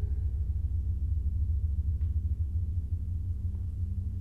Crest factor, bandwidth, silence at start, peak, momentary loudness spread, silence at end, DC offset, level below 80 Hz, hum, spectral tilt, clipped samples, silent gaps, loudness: 10 dB; 0.9 kHz; 0 s; -20 dBFS; 3 LU; 0 s; under 0.1%; -34 dBFS; none; -10.5 dB/octave; under 0.1%; none; -33 LUFS